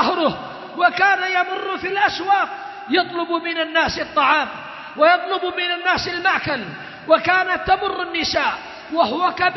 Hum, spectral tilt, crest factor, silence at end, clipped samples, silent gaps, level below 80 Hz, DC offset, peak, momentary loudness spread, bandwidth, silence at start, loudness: none; -4 dB/octave; 18 dB; 0 s; under 0.1%; none; -52 dBFS; under 0.1%; -2 dBFS; 10 LU; 6.2 kHz; 0 s; -19 LUFS